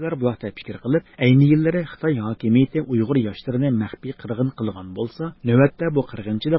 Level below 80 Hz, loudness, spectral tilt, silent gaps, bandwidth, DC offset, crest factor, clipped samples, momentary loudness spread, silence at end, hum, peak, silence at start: -52 dBFS; -21 LUFS; -12.5 dB/octave; none; 5.8 kHz; under 0.1%; 18 dB; under 0.1%; 13 LU; 0 s; none; -4 dBFS; 0 s